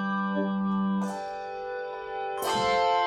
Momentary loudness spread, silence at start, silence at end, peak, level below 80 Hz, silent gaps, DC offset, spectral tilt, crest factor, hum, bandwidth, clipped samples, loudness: 10 LU; 0 s; 0 s; -14 dBFS; -60 dBFS; none; under 0.1%; -5.5 dB/octave; 14 dB; none; 15.5 kHz; under 0.1%; -29 LUFS